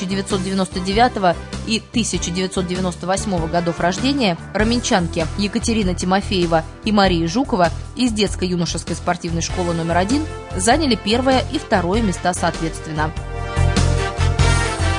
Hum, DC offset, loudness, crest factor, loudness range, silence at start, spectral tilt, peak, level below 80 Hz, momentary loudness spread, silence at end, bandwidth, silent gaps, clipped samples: none; under 0.1%; -19 LUFS; 16 dB; 2 LU; 0 s; -5 dB/octave; -2 dBFS; -30 dBFS; 6 LU; 0 s; 11 kHz; none; under 0.1%